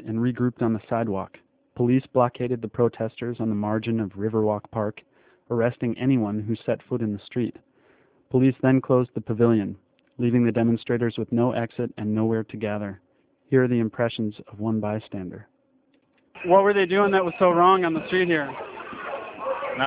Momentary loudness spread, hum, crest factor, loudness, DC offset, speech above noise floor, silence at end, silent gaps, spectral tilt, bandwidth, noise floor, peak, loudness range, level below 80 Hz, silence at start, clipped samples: 12 LU; none; 20 dB; -24 LUFS; under 0.1%; 41 dB; 0 s; none; -11.5 dB/octave; 4 kHz; -64 dBFS; -4 dBFS; 6 LU; -58 dBFS; 0 s; under 0.1%